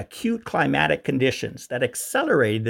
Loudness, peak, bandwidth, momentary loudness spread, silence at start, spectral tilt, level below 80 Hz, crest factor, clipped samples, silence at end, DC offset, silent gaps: -23 LUFS; -4 dBFS; 17 kHz; 7 LU; 0 s; -5 dB/octave; -56 dBFS; 18 dB; under 0.1%; 0 s; under 0.1%; none